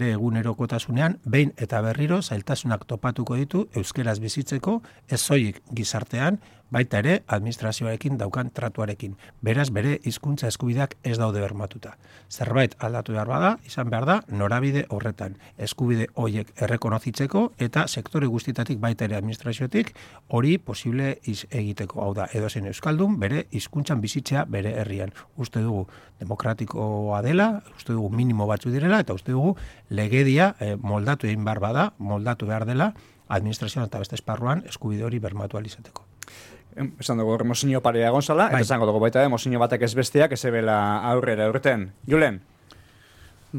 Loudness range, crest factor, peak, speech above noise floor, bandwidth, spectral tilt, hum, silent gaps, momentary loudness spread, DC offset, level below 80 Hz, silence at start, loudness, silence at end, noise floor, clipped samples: 6 LU; 18 dB; -6 dBFS; 27 dB; 16 kHz; -6 dB/octave; none; none; 10 LU; under 0.1%; -56 dBFS; 0 s; -25 LUFS; 0 s; -52 dBFS; under 0.1%